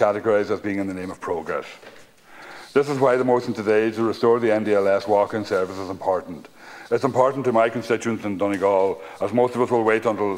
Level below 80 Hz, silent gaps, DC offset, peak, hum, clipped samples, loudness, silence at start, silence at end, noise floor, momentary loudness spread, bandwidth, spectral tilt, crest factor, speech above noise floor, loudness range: -66 dBFS; none; under 0.1%; -2 dBFS; none; under 0.1%; -22 LUFS; 0 s; 0 s; -45 dBFS; 10 LU; 15.5 kHz; -6.5 dB/octave; 20 dB; 24 dB; 4 LU